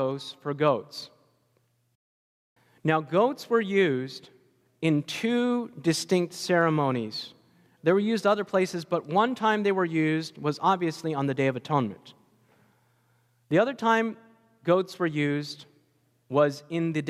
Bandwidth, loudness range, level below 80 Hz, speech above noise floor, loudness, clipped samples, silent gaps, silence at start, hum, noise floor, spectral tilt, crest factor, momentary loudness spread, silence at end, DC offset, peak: 15 kHz; 4 LU; -76 dBFS; 44 dB; -26 LUFS; under 0.1%; 1.95-2.56 s; 0 s; none; -70 dBFS; -6 dB/octave; 18 dB; 11 LU; 0 s; under 0.1%; -10 dBFS